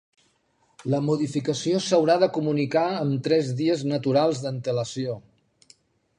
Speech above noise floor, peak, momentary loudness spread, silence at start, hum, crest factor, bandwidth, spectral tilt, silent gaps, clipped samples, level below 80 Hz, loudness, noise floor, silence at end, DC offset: 43 dB; -6 dBFS; 8 LU; 0.8 s; none; 18 dB; 11 kHz; -6 dB/octave; none; under 0.1%; -68 dBFS; -24 LUFS; -67 dBFS; 1 s; under 0.1%